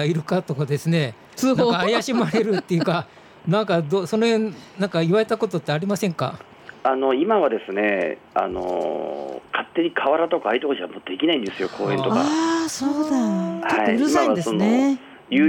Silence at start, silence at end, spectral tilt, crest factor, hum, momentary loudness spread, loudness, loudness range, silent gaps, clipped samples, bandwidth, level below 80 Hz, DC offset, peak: 0 s; 0 s; -5.5 dB/octave; 14 dB; none; 9 LU; -22 LUFS; 2 LU; none; under 0.1%; 17 kHz; -60 dBFS; under 0.1%; -8 dBFS